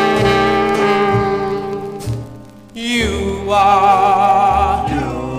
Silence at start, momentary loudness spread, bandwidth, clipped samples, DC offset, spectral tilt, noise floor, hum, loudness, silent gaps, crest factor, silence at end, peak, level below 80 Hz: 0 s; 14 LU; 15.5 kHz; under 0.1%; 0.2%; -5.5 dB/octave; -36 dBFS; none; -14 LUFS; none; 14 dB; 0 s; 0 dBFS; -32 dBFS